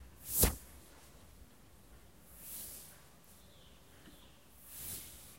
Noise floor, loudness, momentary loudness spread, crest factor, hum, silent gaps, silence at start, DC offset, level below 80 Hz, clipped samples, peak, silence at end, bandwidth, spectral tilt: -61 dBFS; -37 LUFS; 29 LU; 30 dB; none; none; 0 s; under 0.1%; -52 dBFS; under 0.1%; -12 dBFS; 0 s; 16 kHz; -3 dB/octave